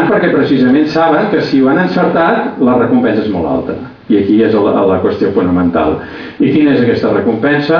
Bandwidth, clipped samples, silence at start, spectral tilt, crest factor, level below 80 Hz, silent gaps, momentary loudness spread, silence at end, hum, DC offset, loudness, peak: 5.4 kHz; under 0.1%; 0 s; -8.5 dB/octave; 10 dB; -44 dBFS; none; 6 LU; 0 s; none; under 0.1%; -11 LUFS; 0 dBFS